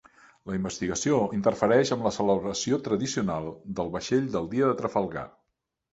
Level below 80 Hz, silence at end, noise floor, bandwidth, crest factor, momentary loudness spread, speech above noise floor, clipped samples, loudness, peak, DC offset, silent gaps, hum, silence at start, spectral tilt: -56 dBFS; 0.65 s; -80 dBFS; 8.2 kHz; 20 dB; 11 LU; 54 dB; under 0.1%; -27 LUFS; -8 dBFS; under 0.1%; none; none; 0.45 s; -5 dB/octave